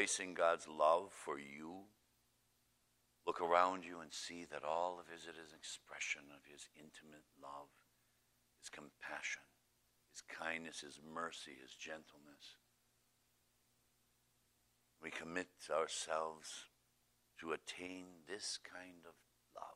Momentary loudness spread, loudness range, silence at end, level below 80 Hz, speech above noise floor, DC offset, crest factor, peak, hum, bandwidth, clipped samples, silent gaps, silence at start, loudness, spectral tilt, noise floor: 22 LU; 12 LU; 0 s; -84 dBFS; 35 dB; under 0.1%; 28 dB; -18 dBFS; 60 Hz at -85 dBFS; 15.5 kHz; under 0.1%; none; 0 s; -43 LUFS; -2 dB/octave; -79 dBFS